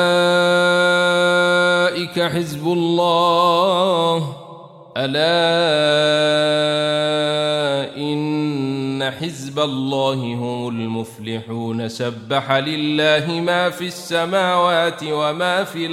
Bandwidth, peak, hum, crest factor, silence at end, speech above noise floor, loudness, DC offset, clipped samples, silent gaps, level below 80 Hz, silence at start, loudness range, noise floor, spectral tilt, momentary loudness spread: 15 kHz; -2 dBFS; none; 16 dB; 0 s; 21 dB; -18 LUFS; under 0.1%; under 0.1%; none; -64 dBFS; 0 s; 6 LU; -39 dBFS; -5 dB/octave; 10 LU